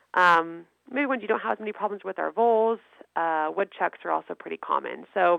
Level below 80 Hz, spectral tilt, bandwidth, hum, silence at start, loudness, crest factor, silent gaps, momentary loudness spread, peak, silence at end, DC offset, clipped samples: -80 dBFS; -5.5 dB/octave; 10 kHz; none; 0.15 s; -26 LUFS; 20 dB; none; 13 LU; -6 dBFS; 0 s; under 0.1%; under 0.1%